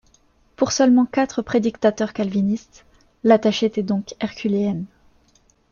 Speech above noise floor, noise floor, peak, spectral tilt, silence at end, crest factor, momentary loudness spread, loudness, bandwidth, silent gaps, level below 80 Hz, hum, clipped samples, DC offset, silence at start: 39 dB; -59 dBFS; -2 dBFS; -5.5 dB/octave; 0.85 s; 18 dB; 10 LU; -20 LUFS; 7.2 kHz; none; -56 dBFS; none; under 0.1%; under 0.1%; 0.6 s